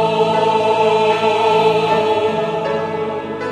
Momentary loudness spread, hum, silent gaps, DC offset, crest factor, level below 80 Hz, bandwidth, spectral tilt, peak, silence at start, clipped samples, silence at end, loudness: 7 LU; none; none; under 0.1%; 14 dB; -58 dBFS; 10.5 kHz; -5.5 dB/octave; -2 dBFS; 0 s; under 0.1%; 0 s; -16 LUFS